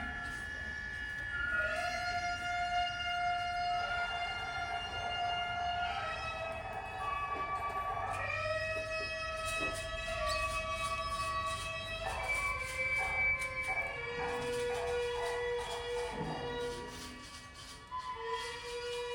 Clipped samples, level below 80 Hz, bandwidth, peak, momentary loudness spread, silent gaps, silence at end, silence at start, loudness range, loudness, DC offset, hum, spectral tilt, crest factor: under 0.1%; -52 dBFS; 17.5 kHz; -22 dBFS; 7 LU; none; 0 s; 0 s; 4 LU; -36 LUFS; under 0.1%; none; -3 dB/octave; 14 dB